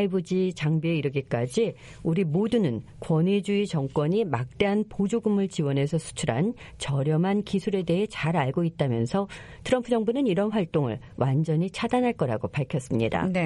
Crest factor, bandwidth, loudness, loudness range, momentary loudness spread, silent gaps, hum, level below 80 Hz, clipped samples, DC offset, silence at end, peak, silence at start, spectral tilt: 18 dB; 11.5 kHz; -26 LUFS; 1 LU; 5 LU; none; none; -54 dBFS; under 0.1%; under 0.1%; 0 s; -8 dBFS; 0 s; -7 dB/octave